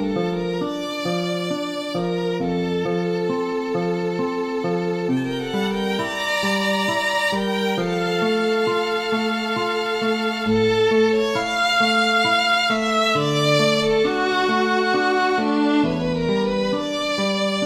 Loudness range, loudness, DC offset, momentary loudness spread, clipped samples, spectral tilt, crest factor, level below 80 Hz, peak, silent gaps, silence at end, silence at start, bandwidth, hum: 5 LU; -21 LUFS; under 0.1%; 7 LU; under 0.1%; -5 dB/octave; 14 dB; -50 dBFS; -6 dBFS; none; 0 s; 0 s; 16 kHz; none